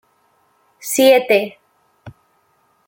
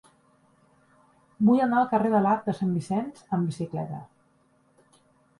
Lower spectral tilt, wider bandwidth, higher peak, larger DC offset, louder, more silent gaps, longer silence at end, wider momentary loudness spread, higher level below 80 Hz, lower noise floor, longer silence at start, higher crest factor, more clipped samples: second, -2.5 dB/octave vs -8.5 dB/octave; first, 16.5 kHz vs 11.5 kHz; first, -2 dBFS vs -10 dBFS; neither; first, -14 LUFS vs -25 LUFS; neither; second, 0.8 s vs 1.35 s; first, 18 LU vs 11 LU; about the same, -64 dBFS vs -68 dBFS; second, -61 dBFS vs -65 dBFS; second, 0.85 s vs 1.4 s; about the same, 18 dB vs 18 dB; neither